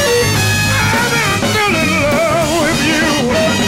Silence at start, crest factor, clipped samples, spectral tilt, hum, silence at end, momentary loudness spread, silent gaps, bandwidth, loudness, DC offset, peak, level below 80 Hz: 0 s; 8 dB; under 0.1%; -4 dB/octave; none; 0 s; 1 LU; none; 16.5 kHz; -12 LUFS; under 0.1%; -6 dBFS; -34 dBFS